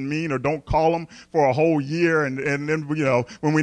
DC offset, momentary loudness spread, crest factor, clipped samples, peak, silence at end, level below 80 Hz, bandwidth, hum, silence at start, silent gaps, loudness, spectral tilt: under 0.1%; 5 LU; 14 dB; under 0.1%; -6 dBFS; 0 s; -44 dBFS; 10 kHz; none; 0 s; none; -22 LUFS; -7 dB/octave